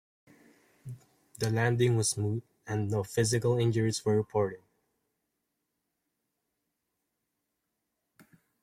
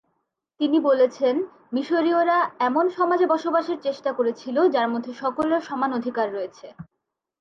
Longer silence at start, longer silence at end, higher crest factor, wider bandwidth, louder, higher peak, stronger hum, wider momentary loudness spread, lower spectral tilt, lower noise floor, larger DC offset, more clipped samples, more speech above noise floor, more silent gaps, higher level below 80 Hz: first, 0.85 s vs 0.6 s; first, 4.05 s vs 0.6 s; first, 20 dB vs 14 dB; first, 16 kHz vs 7.4 kHz; second, -29 LUFS vs -23 LUFS; second, -12 dBFS vs -8 dBFS; neither; first, 21 LU vs 8 LU; about the same, -5.5 dB/octave vs -5.5 dB/octave; first, -83 dBFS vs -76 dBFS; neither; neither; about the same, 55 dB vs 53 dB; neither; first, -64 dBFS vs -70 dBFS